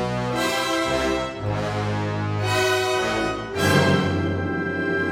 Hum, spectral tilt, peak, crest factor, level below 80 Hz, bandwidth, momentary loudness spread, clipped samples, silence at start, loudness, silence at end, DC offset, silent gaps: none; -5 dB/octave; -4 dBFS; 18 dB; -44 dBFS; 17 kHz; 6 LU; under 0.1%; 0 s; -22 LUFS; 0 s; under 0.1%; none